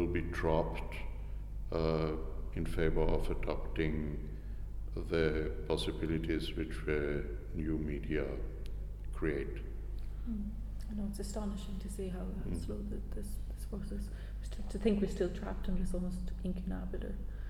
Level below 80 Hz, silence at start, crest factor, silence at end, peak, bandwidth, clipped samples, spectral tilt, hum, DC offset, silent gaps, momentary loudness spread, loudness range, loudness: -40 dBFS; 0 s; 18 dB; 0 s; -16 dBFS; 13.5 kHz; under 0.1%; -7 dB/octave; 50 Hz at -40 dBFS; under 0.1%; none; 11 LU; 5 LU; -38 LUFS